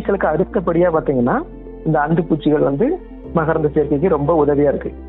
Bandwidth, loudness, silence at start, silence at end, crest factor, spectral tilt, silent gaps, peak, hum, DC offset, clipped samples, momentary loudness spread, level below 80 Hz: 4.1 kHz; -17 LUFS; 0 s; 0 s; 12 dB; -12 dB/octave; none; -4 dBFS; none; under 0.1%; under 0.1%; 6 LU; -36 dBFS